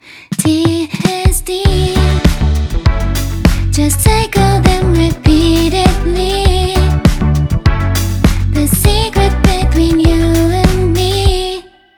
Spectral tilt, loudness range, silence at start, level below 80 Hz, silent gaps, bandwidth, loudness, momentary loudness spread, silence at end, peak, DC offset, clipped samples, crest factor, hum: -5.5 dB/octave; 2 LU; 0.1 s; -16 dBFS; none; over 20 kHz; -12 LUFS; 4 LU; 0.35 s; 0 dBFS; under 0.1%; under 0.1%; 10 dB; none